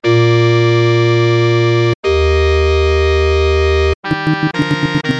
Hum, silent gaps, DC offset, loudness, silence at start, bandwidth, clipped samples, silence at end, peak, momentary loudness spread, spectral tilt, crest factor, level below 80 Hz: none; 1.95-2.03 s, 3.95-4.03 s; under 0.1%; -13 LUFS; 0 s; 8 kHz; under 0.1%; 0 s; -2 dBFS; 4 LU; -7 dB/octave; 10 dB; -22 dBFS